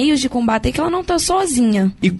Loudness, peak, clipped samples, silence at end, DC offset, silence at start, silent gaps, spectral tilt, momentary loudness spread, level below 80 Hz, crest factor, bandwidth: -17 LUFS; -4 dBFS; under 0.1%; 0 s; under 0.1%; 0 s; none; -4.5 dB/octave; 3 LU; -34 dBFS; 12 dB; 12 kHz